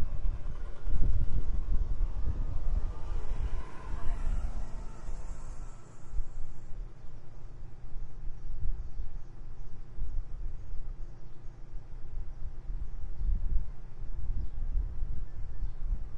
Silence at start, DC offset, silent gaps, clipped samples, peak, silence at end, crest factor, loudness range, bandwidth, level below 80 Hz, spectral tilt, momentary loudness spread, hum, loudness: 0 s; under 0.1%; none; under 0.1%; -10 dBFS; 0 s; 18 dB; 10 LU; 2.5 kHz; -34 dBFS; -7.5 dB/octave; 14 LU; none; -41 LUFS